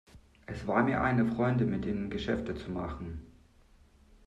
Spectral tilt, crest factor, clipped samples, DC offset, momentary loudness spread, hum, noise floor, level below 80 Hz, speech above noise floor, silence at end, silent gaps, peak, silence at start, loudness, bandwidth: -8 dB/octave; 18 dB; under 0.1%; under 0.1%; 16 LU; none; -61 dBFS; -50 dBFS; 30 dB; 0.95 s; none; -14 dBFS; 0.15 s; -31 LUFS; 9 kHz